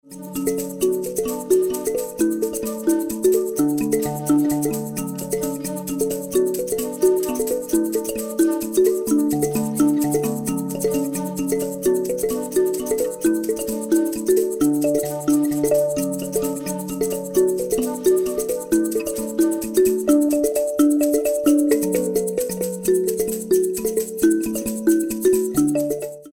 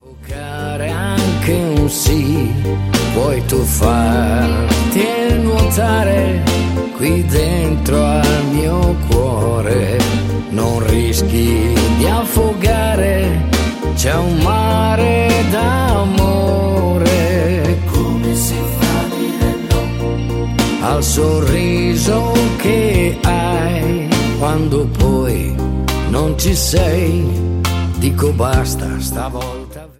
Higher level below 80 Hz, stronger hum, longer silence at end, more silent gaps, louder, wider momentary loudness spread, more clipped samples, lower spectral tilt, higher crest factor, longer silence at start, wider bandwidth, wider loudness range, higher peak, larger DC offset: second, -50 dBFS vs -22 dBFS; neither; about the same, 0.05 s vs 0.1 s; neither; second, -21 LUFS vs -15 LUFS; about the same, 6 LU vs 5 LU; neither; about the same, -5 dB/octave vs -5.5 dB/octave; about the same, 16 dB vs 14 dB; about the same, 0.05 s vs 0.05 s; first, 18.5 kHz vs 16.5 kHz; about the same, 3 LU vs 2 LU; second, -4 dBFS vs 0 dBFS; neither